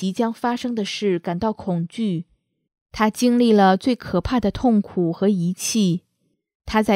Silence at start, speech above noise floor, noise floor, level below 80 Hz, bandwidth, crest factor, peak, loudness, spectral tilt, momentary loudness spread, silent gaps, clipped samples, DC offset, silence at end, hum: 0 s; 51 dB; -70 dBFS; -44 dBFS; 16 kHz; 18 dB; -2 dBFS; -21 LUFS; -5.5 dB/octave; 10 LU; 2.81-2.86 s, 6.55-6.60 s; under 0.1%; under 0.1%; 0 s; none